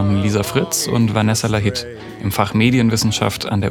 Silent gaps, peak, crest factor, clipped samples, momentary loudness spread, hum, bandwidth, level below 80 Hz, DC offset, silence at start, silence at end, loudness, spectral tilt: none; 0 dBFS; 16 dB; under 0.1%; 8 LU; none; 19 kHz; -44 dBFS; under 0.1%; 0 s; 0 s; -17 LUFS; -5 dB/octave